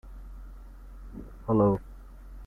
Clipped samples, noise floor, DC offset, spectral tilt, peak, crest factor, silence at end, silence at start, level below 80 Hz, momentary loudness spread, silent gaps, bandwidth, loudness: under 0.1%; -45 dBFS; under 0.1%; -11 dB/octave; -12 dBFS; 18 dB; 0 s; 0.05 s; -44 dBFS; 26 LU; none; 3.1 kHz; -27 LUFS